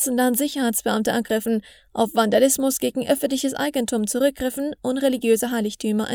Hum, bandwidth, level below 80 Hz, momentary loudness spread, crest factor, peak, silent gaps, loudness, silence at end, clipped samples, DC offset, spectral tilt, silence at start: none; over 20 kHz; -56 dBFS; 7 LU; 16 dB; -4 dBFS; none; -22 LUFS; 0 s; under 0.1%; under 0.1%; -3.5 dB/octave; 0 s